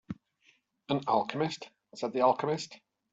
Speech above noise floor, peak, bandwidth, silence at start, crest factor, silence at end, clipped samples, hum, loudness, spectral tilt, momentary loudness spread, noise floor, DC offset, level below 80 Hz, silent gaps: 38 dB; -12 dBFS; 8.2 kHz; 0.1 s; 22 dB; 0.35 s; under 0.1%; none; -31 LUFS; -5.5 dB/octave; 18 LU; -69 dBFS; under 0.1%; -72 dBFS; none